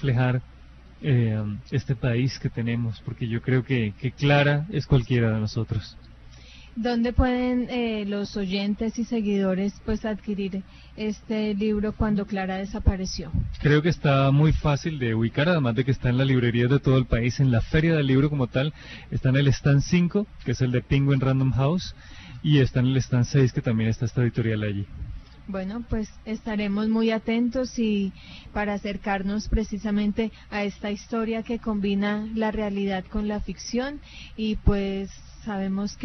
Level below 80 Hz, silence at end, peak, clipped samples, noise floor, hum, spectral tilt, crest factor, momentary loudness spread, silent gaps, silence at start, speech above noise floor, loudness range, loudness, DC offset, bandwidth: -38 dBFS; 0 s; -6 dBFS; under 0.1%; -46 dBFS; none; -7 dB/octave; 18 dB; 10 LU; none; 0 s; 22 dB; 5 LU; -25 LUFS; under 0.1%; 6.4 kHz